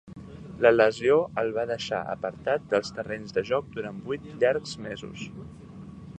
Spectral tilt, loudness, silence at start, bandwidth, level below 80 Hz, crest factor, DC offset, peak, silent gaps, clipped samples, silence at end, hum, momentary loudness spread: -5.5 dB/octave; -27 LUFS; 0.05 s; 9.2 kHz; -58 dBFS; 22 dB; under 0.1%; -4 dBFS; none; under 0.1%; 0 s; none; 22 LU